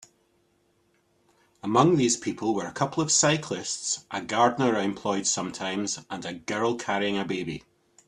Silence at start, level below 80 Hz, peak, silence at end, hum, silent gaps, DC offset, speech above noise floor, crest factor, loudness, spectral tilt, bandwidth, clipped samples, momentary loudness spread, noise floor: 1.65 s; -66 dBFS; -6 dBFS; 0.5 s; none; none; under 0.1%; 42 dB; 20 dB; -26 LUFS; -3.5 dB/octave; 11.5 kHz; under 0.1%; 11 LU; -68 dBFS